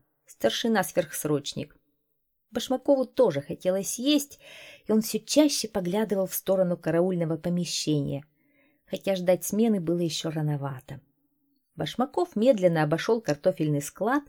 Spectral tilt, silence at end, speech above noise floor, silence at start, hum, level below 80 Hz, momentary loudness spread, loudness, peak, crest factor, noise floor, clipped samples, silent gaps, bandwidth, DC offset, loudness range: -5 dB/octave; 0.05 s; 50 dB; 0.4 s; none; -64 dBFS; 13 LU; -26 LUFS; -8 dBFS; 20 dB; -76 dBFS; under 0.1%; none; 19.5 kHz; under 0.1%; 3 LU